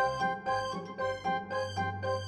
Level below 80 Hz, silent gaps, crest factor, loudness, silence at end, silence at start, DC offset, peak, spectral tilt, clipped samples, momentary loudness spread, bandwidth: -62 dBFS; none; 14 dB; -34 LUFS; 0 s; 0 s; under 0.1%; -18 dBFS; -5 dB/octave; under 0.1%; 4 LU; 11.5 kHz